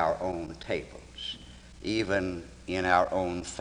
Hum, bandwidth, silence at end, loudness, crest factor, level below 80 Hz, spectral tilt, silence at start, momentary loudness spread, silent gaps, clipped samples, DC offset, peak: none; 11 kHz; 0 s; -31 LUFS; 22 dB; -52 dBFS; -4.5 dB/octave; 0 s; 15 LU; none; under 0.1%; under 0.1%; -8 dBFS